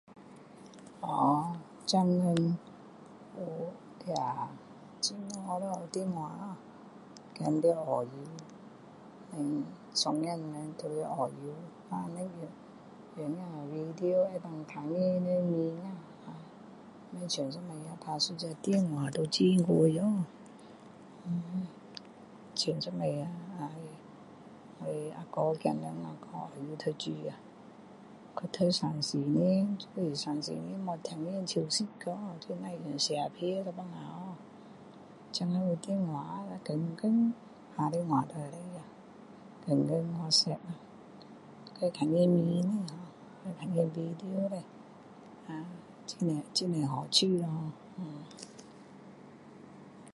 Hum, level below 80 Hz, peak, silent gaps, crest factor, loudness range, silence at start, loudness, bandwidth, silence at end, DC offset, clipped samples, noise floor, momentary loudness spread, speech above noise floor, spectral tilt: none; -76 dBFS; -10 dBFS; none; 24 dB; 7 LU; 0.1 s; -33 LUFS; 11.5 kHz; 0 s; under 0.1%; under 0.1%; -53 dBFS; 24 LU; 20 dB; -5.5 dB/octave